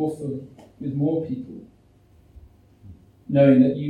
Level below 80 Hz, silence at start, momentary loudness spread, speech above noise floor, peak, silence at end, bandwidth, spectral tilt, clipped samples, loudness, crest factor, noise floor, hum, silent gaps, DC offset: -56 dBFS; 0 s; 21 LU; 34 dB; -4 dBFS; 0 s; 9.4 kHz; -9.5 dB/octave; under 0.1%; -22 LUFS; 20 dB; -55 dBFS; none; none; under 0.1%